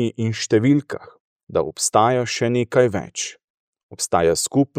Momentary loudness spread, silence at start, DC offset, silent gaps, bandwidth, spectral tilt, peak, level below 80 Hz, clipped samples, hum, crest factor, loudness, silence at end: 11 LU; 0 s; under 0.1%; 1.20-1.47 s, 3.44-3.73 s, 3.83-3.89 s; 15.5 kHz; -4.5 dB/octave; -2 dBFS; -54 dBFS; under 0.1%; none; 18 dB; -20 LUFS; 0 s